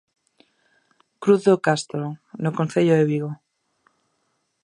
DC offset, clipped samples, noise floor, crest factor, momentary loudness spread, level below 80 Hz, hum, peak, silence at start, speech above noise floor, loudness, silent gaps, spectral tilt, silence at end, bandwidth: under 0.1%; under 0.1%; -72 dBFS; 20 dB; 14 LU; -72 dBFS; none; -4 dBFS; 1.2 s; 51 dB; -21 LUFS; none; -6.5 dB/octave; 1.3 s; 11 kHz